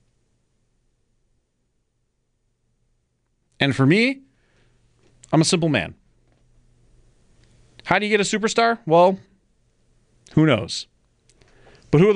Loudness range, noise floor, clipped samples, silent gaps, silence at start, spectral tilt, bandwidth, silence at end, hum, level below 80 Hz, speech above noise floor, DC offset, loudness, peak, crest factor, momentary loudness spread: 5 LU; -71 dBFS; under 0.1%; none; 3.6 s; -5 dB/octave; 10.5 kHz; 0 s; none; -54 dBFS; 52 dB; under 0.1%; -19 LUFS; -4 dBFS; 18 dB; 15 LU